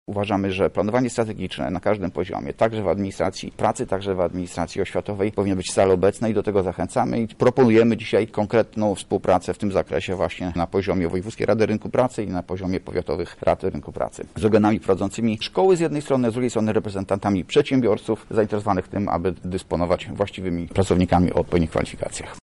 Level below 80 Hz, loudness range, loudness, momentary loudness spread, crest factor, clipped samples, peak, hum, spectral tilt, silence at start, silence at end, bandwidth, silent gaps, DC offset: -46 dBFS; 4 LU; -22 LUFS; 8 LU; 14 dB; under 0.1%; -8 dBFS; none; -6.5 dB/octave; 0.1 s; 0.05 s; 11.5 kHz; none; under 0.1%